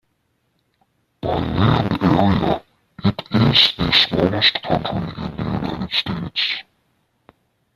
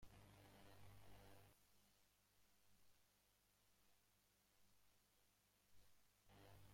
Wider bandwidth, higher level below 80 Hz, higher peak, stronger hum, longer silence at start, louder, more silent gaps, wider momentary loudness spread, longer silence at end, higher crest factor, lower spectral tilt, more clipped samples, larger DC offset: second, 14 kHz vs 16.5 kHz; first, -42 dBFS vs -80 dBFS; first, -2 dBFS vs -52 dBFS; second, none vs 50 Hz at -85 dBFS; first, 1.25 s vs 0 s; first, -18 LUFS vs -69 LUFS; neither; first, 12 LU vs 1 LU; first, 1.15 s vs 0 s; about the same, 20 dB vs 18 dB; first, -6.5 dB/octave vs -4 dB/octave; neither; neither